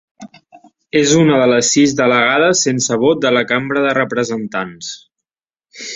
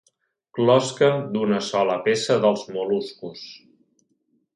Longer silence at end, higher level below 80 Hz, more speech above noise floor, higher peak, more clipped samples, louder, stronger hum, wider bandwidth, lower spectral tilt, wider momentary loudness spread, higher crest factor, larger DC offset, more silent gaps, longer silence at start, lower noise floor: second, 0 s vs 1 s; first, -56 dBFS vs -70 dBFS; first, over 76 dB vs 48 dB; first, -2 dBFS vs -6 dBFS; neither; first, -13 LUFS vs -21 LUFS; neither; second, 8 kHz vs 11 kHz; second, -3.5 dB/octave vs -5 dB/octave; second, 13 LU vs 17 LU; about the same, 14 dB vs 18 dB; neither; neither; second, 0.2 s vs 0.55 s; first, under -90 dBFS vs -69 dBFS